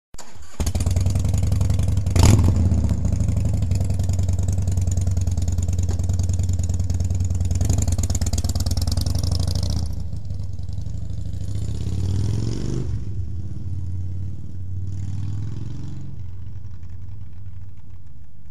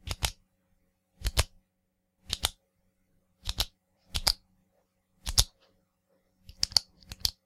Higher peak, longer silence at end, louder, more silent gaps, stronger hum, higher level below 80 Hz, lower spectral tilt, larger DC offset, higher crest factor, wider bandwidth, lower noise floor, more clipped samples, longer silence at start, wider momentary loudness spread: about the same, 0 dBFS vs 0 dBFS; second, 0 s vs 0.15 s; first, -24 LUFS vs -31 LUFS; neither; neither; first, -28 dBFS vs -42 dBFS; first, -6 dB/octave vs -1 dB/octave; first, 5% vs under 0.1%; second, 22 dB vs 34 dB; second, 14 kHz vs 16.5 kHz; second, -44 dBFS vs -78 dBFS; neither; about the same, 0.1 s vs 0.05 s; first, 16 LU vs 13 LU